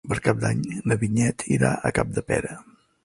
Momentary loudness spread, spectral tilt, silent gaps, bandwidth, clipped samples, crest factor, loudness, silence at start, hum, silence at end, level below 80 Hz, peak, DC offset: 5 LU; -6 dB/octave; none; 11.5 kHz; under 0.1%; 20 dB; -24 LUFS; 0.05 s; none; 0.45 s; -46 dBFS; -4 dBFS; under 0.1%